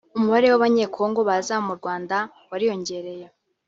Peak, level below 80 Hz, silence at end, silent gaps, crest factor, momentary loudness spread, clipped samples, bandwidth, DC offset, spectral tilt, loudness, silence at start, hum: -6 dBFS; -68 dBFS; 0.4 s; none; 16 dB; 14 LU; under 0.1%; 7.8 kHz; under 0.1%; -5 dB/octave; -22 LUFS; 0.15 s; none